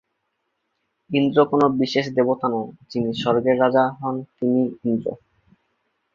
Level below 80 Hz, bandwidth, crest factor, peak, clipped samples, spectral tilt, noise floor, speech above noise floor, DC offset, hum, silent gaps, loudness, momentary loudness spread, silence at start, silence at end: -62 dBFS; 7.2 kHz; 20 dB; -2 dBFS; under 0.1%; -7 dB/octave; -75 dBFS; 54 dB; under 0.1%; none; none; -21 LUFS; 10 LU; 1.1 s; 1 s